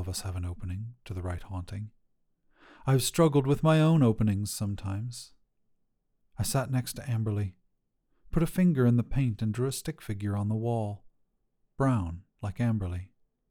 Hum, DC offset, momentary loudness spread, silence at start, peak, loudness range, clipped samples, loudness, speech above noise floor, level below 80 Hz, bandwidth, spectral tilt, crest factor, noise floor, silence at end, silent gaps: none; under 0.1%; 15 LU; 0 s; -12 dBFS; 7 LU; under 0.1%; -29 LUFS; 46 dB; -48 dBFS; 19.5 kHz; -6.5 dB/octave; 18 dB; -74 dBFS; 0.45 s; none